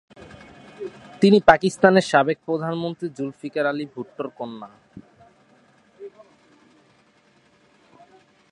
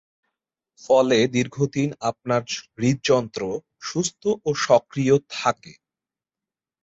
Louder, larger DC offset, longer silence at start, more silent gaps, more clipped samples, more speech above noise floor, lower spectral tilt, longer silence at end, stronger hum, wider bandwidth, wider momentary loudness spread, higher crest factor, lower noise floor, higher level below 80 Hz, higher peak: about the same, -20 LUFS vs -22 LUFS; neither; second, 0.2 s vs 0.85 s; neither; neither; second, 39 dB vs over 68 dB; about the same, -6 dB/octave vs -5 dB/octave; first, 2.45 s vs 1.1 s; neither; first, 11 kHz vs 8.2 kHz; first, 26 LU vs 10 LU; about the same, 24 dB vs 20 dB; second, -59 dBFS vs under -90 dBFS; about the same, -60 dBFS vs -60 dBFS; first, 0 dBFS vs -4 dBFS